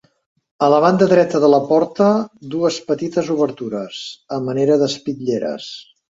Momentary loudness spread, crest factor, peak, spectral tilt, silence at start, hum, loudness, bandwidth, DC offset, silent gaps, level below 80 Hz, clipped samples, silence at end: 13 LU; 16 dB; 0 dBFS; -6 dB/octave; 0.6 s; none; -17 LUFS; 7.8 kHz; under 0.1%; none; -62 dBFS; under 0.1%; 0.3 s